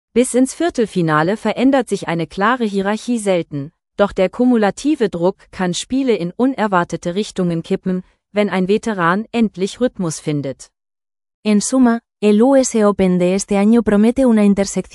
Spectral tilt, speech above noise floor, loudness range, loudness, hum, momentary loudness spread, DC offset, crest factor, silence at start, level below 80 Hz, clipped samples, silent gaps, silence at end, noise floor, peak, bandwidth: -5.5 dB/octave; over 74 dB; 5 LU; -16 LUFS; none; 9 LU; under 0.1%; 16 dB; 0.15 s; -48 dBFS; under 0.1%; 11.34-11.43 s; 0.1 s; under -90 dBFS; 0 dBFS; 12 kHz